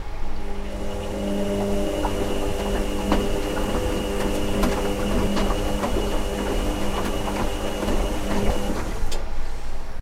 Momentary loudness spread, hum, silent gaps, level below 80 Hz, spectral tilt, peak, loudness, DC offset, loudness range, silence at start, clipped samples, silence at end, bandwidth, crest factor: 9 LU; none; none; -26 dBFS; -5 dB/octave; -4 dBFS; -26 LUFS; under 0.1%; 2 LU; 0 s; under 0.1%; 0 s; 15.5 kHz; 18 dB